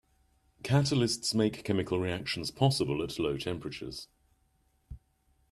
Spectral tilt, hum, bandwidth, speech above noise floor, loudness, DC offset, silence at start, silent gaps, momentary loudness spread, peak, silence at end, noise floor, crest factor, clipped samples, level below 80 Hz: -5.5 dB/octave; none; 13.5 kHz; 41 dB; -31 LUFS; under 0.1%; 0.65 s; none; 12 LU; -12 dBFS; 0.55 s; -71 dBFS; 20 dB; under 0.1%; -58 dBFS